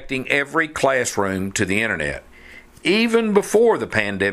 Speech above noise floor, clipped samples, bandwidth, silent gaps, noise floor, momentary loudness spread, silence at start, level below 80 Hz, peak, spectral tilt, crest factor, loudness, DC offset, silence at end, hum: 24 dB; under 0.1%; 14.5 kHz; none; -44 dBFS; 7 LU; 0 s; -48 dBFS; 0 dBFS; -4 dB/octave; 20 dB; -19 LUFS; under 0.1%; 0 s; none